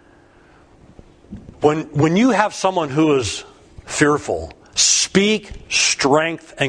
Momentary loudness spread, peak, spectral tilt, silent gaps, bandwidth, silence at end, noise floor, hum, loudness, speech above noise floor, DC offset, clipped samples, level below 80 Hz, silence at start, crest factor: 11 LU; 0 dBFS; -3.5 dB/octave; none; 10.5 kHz; 0 s; -50 dBFS; none; -17 LUFS; 32 dB; under 0.1%; under 0.1%; -46 dBFS; 1.3 s; 18 dB